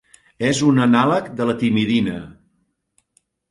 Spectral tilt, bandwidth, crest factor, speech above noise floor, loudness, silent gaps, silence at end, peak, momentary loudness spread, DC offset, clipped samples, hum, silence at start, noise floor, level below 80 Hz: -5.5 dB/octave; 11.5 kHz; 18 dB; 51 dB; -18 LUFS; none; 1.2 s; -2 dBFS; 9 LU; under 0.1%; under 0.1%; none; 0.4 s; -68 dBFS; -54 dBFS